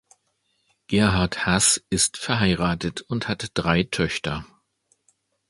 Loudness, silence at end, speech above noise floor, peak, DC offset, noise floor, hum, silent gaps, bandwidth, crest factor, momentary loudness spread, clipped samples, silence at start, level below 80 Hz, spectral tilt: -22 LUFS; 1.05 s; 48 dB; -2 dBFS; under 0.1%; -71 dBFS; none; none; 12 kHz; 22 dB; 10 LU; under 0.1%; 0.9 s; -42 dBFS; -3.5 dB/octave